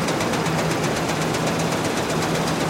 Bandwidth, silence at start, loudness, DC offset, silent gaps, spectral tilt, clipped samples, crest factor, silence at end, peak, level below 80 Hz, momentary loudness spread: 16.5 kHz; 0 s; -22 LUFS; under 0.1%; none; -4.5 dB/octave; under 0.1%; 12 dB; 0 s; -10 dBFS; -48 dBFS; 1 LU